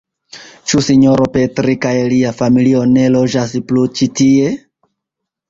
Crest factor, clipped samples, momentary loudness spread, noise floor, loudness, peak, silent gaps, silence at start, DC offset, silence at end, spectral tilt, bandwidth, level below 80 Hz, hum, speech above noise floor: 12 dB; under 0.1%; 6 LU; -79 dBFS; -12 LUFS; 0 dBFS; none; 0.35 s; under 0.1%; 0.95 s; -6 dB/octave; 7.8 kHz; -46 dBFS; none; 68 dB